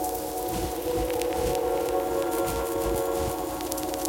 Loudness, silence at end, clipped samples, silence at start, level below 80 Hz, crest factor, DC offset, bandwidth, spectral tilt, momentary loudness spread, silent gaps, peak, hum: -28 LUFS; 0 s; under 0.1%; 0 s; -42 dBFS; 24 dB; under 0.1%; 17 kHz; -4.5 dB/octave; 4 LU; none; -4 dBFS; none